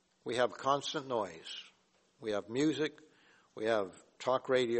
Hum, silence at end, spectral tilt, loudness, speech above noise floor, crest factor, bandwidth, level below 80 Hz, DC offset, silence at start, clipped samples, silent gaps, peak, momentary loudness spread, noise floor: none; 0 s; -4.5 dB/octave; -35 LUFS; 37 dB; 20 dB; 8.4 kHz; -78 dBFS; under 0.1%; 0.25 s; under 0.1%; none; -16 dBFS; 13 LU; -71 dBFS